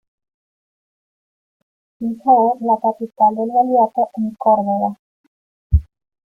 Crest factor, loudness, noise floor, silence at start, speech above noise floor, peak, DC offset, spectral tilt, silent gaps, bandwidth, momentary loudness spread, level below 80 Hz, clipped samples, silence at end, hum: 18 dB; -17 LUFS; under -90 dBFS; 2 s; over 74 dB; -2 dBFS; under 0.1%; -12 dB/octave; 4.99-5.70 s; 1.6 kHz; 8 LU; -32 dBFS; under 0.1%; 0.5 s; none